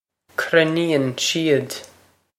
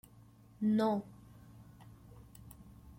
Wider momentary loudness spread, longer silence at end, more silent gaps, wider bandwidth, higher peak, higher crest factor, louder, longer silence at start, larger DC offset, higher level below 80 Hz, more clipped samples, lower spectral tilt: second, 13 LU vs 26 LU; first, 0.55 s vs 0.05 s; neither; about the same, 16 kHz vs 16.5 kHz; first, 0 dBFS vs -22 dBFS; about the same, 20 dB vs 18 dB; first, -20 LUFS vs -34 LUFS; second, 0.4 s vs 0.6 s; neither; about the same, -68 dBFS vs -64 dBFS; neither; second, -4 dB/octave vs -7.5 dB/octave